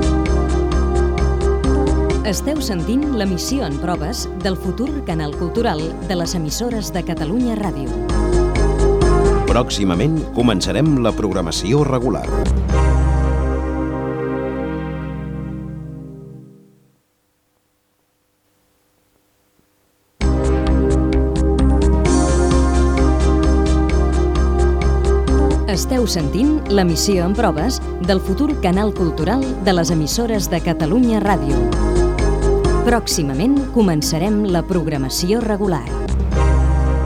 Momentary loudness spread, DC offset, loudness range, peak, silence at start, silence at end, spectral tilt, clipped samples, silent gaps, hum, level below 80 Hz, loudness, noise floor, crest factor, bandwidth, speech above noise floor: 7 LU; under 0.1%; 7 LU; -2 dBFS; 0 s; 0 s; -6 dB/octave; under 0.1%; none; none; -20 dBFS; -18 LUFS; -64 dBFS; 16 dB; 15 kHz; 47 dB